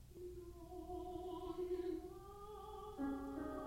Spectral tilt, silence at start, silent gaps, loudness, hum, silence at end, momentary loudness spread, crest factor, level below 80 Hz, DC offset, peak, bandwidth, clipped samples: -7 dB/octave; 0 s; none; -48 LUFS; none; 0 s; 10 LU; 14 dB; -60 dBFS; under 0.1%; -34 dBFS; 16.5 kHz; under 0.1%